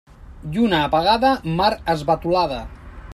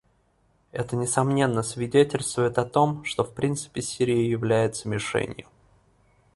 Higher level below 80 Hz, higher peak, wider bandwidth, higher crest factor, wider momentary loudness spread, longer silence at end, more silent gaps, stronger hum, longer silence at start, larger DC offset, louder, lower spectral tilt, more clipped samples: first, -40 dBFS vs -56 dBFS; about the same, -4 dBFS vs -6 dBFS; first, 15 kHz vs 11.5 kHz; about the same, 16 dB vs 20 dB; first, 13 LU vs 8 LU; second, 0 s vs 0.95 s; neither; neither; second, 0.2 s vs 0.75 s; neither; first, -19 LUFS vs -25 LUFS; about the same, -6 dB/octave vs -5 dB/octave; neither